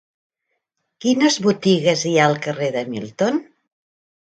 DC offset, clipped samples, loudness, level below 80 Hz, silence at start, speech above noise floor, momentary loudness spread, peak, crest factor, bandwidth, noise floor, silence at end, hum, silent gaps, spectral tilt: under 0.1%; under 0.1%; -19 LUFS; -66 dBFS; 1.05 s; 57 dB; 9 LU; -2 dBFS; 18 dB; 9.2 kHz; -76 dBFS; 0.8 s; none; none; -4.5 dB/octave